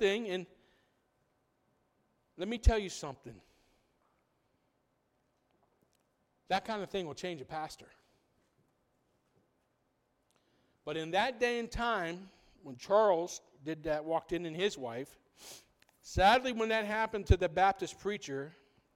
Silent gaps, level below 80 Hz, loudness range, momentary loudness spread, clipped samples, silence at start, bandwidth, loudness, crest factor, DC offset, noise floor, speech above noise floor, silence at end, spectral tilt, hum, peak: none; -46 dBFS; 13 LU; 21 LU; under 0.1%; 0 s; 16.5 kHz; -33 LUFS; 26 dB; under 0.1%; -78 dBFS; 44 dB; 0.45 s; -5 dB/octave; none; -10 dBFS